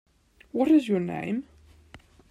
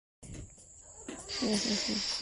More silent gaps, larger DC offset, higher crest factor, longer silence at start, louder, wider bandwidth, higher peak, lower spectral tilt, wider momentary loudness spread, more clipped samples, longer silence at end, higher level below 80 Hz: neither; neither; about the same, 16 dB vs 18 dB; first, 0.55 s vs 0.2 s; first, -26 LUFS vs -32 LUFS; about the same, 10.5 kHz vs 11.5 kHz; first, -10 dBFS vs -18 dBFS; first, -7.5 dB/octave vs -2.5 dB/octave; second, 12 LU vs 21 LU; neither; first, 0.35 s vs 0 s; about the same, -60 dBFS vs -58 dBFS